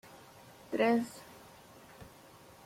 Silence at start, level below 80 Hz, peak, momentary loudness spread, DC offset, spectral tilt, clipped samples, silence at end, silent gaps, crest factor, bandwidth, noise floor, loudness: 0.7 s; -72 dBFS; -18 dBFS; 26 LU; under 0.1%; -5 dB/octave; under 0.1%; 0.6 s; none; 20 dB; 16.5 kHz; -57 dBFS; -32 LUFS